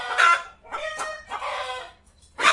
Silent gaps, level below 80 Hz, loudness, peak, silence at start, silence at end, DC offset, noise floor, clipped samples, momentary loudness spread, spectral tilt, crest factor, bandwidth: none; -60 dBFS; -24 LUFS; -2 dBFS; 0 s; 0 s; under 0.1%; -53 dBFS; under 0.1%; 17 LU; 0.5 dB/octave; 22 dB; 11.5 kHz